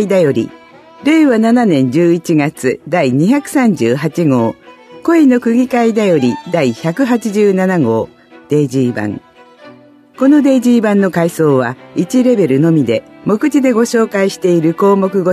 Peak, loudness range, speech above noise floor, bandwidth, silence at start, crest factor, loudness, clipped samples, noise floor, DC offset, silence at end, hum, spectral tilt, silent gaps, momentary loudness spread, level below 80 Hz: 0 dBFS; 3 LU; 29 dB; 14 kHz; 0 s; 12 dB; -12 LUFS; under 0.1%; -40 dBFS; under 0.1%; 0 s; none; -7 dB/octave; none; 8 LU; -58 dBFS